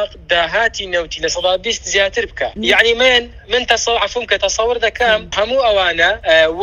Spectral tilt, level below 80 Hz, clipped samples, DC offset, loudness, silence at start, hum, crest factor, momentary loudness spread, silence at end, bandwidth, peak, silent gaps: -1.5 dB/octave; -38 dBFS; under 0.1%; under 0.1%; -14 LUFS; 0 s; none; 16 dB; 7 LU; 0 s; 13 kHz; 0 dBFS; none